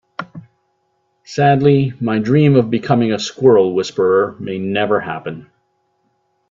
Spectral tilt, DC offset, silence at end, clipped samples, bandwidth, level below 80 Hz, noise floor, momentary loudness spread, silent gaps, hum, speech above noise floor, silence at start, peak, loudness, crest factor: -7 dB/octave; under 0.1%; 1.1 s; under 0.1%; 7.6 kHz; -56 dBFS; -65 dBFS; 16 LU; none; none; 51 dB; 0.2 s; 0 dBFS; -15 LUFS; 16 dB